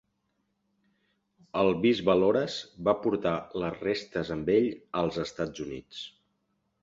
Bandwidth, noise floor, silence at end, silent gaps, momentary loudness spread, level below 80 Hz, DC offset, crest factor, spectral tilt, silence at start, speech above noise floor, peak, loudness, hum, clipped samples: 7.8 kHz; -77 dBFS; 0.75 s; none; 15 LU; -60 dBFS; under 0.1%; 20 dB; -6 dB/octave; 1.55 s; 49 dB; -10 dBFS; -28 LUFS; none; under 0.1%